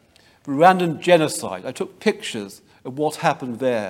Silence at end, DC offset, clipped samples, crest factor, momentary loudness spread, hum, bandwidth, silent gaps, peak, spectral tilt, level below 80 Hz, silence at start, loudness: 0 s; under 0.1%; under 0.1%; 20 dB; 18 LU; none; 16.5 kHz; none; 0 dBFS; -5 dB/octave; -68 dBFS; 0.45 s; -20 LUFS